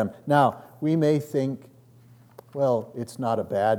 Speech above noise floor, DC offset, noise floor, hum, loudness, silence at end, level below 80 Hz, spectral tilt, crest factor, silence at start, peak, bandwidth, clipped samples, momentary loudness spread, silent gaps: 29 dB; under 0.1%; -53 dBFS; none; -25 LUFS; 0 s; -72 dBFS; -7.5 dB/octave; 18 dB; 0 s; -6 dBFS; 18.5 kHz; under 0.1%; 11 LU; none